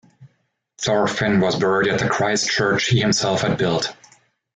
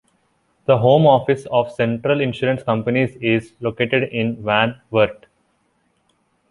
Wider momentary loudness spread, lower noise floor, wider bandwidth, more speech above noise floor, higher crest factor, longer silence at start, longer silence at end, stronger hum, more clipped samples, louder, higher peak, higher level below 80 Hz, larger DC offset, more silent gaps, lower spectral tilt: second, 4 LU vs 8 LU; about the same, -68 dBFS vs -65 dBFS; second, 9.4 kHz vs 11 kHz; about the same, 50 dB vs 47 dB; about the same, 14 dB vs 18 dB; second, 0.2 s vs 0.7 s; second, 0.6 s vs 1.35 s; neither; neither; about the same, -19 LUFS vs -18 LUFS; second, -6 dBFS vs -2 dBFS; about the same, -52 dBFS vs -54 dBFS; neither; neither; second, -4 dB/octave vs -7.5 dB/octave